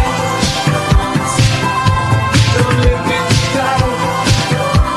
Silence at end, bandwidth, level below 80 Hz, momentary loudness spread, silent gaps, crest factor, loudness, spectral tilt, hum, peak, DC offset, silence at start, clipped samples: 0 s; 13.5 kHz; -22 dBFS; 3 LU; none; 12 dB; -13 LUFS; -5 dB/octave; none; 0 dBFS; under 0.1%; 0 s; under 0.1%